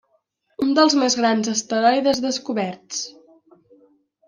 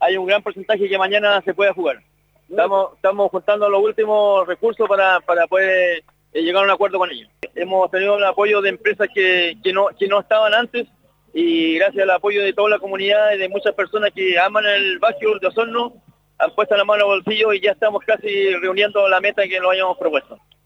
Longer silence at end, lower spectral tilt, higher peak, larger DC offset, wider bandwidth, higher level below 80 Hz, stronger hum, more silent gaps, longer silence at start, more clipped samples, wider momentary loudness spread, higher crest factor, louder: first, 1.15 s vs 0.3 s; second, -3 dB/octave vs -5 dB/octave; about the same, -4 dBFS vs -4 dBFS; neither; first, 10.5 kHz vs 7.6 kHz; about the same, -64 dBFS vs -66 dBFS; second, none vs 50 Hz at -65 dBFS; neither; first, 0.6 s vs 0 s; neither; first, 13 LU vs 7 LU; about the same, 18 dB vs 14 dB; second, -20 LUFS vs -17 LUFS